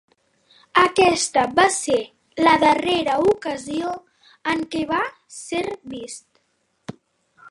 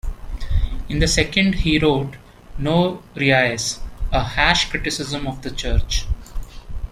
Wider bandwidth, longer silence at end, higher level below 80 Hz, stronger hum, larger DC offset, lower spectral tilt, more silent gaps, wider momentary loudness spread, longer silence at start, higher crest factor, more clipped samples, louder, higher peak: second, 11.5 kHz vs 15 kHz; about the same, 0 s vs 0 s; second, -56 dBFS vs -26 dBFS; neither; neither; about the same, -3 dB/octave vs -4 dB/octave; neither; first, 20 LU vs 17 LU; first, 0.75 s vs 0.05 s; about the same, 20 dB vs 20 dB; neither; about the same, -20 LUFS vs -20 LUFS; about the same, 0 dBFS vs 0 dBFS